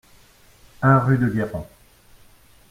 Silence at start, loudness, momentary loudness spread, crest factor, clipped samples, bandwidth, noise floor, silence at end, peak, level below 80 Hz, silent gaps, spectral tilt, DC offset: 0.8 s; -20 LUFS; 17 LU; 20 dB; under 0.1%; 14 kHz; -52 dBFS; 1.05 s; -4 dBFS; -50 dBFS; none; -9 dB/octave; under 0.1%